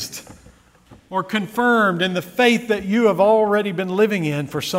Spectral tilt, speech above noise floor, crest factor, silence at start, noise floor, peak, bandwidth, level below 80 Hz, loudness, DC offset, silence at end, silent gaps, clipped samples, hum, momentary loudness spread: -5 dB/octave; 32 dB; 18 dB; 0 s; -50 dBFS; -2 dBFS; 16 kHz; -56 dBFS; -18 LUFS; under 0.1%; 0 s; none; under 0.1%; none; 9 LU